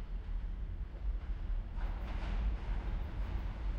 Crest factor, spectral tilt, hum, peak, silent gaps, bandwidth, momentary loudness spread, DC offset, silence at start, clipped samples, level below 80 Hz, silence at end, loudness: 12 dB; -7.5 dB/octave; none; -26 dBFS; none; 5.6 kHz; 5 LU; under 0.1%; 0 s; under 0.1%; -38 dBFS; 0 s; -42 LUFS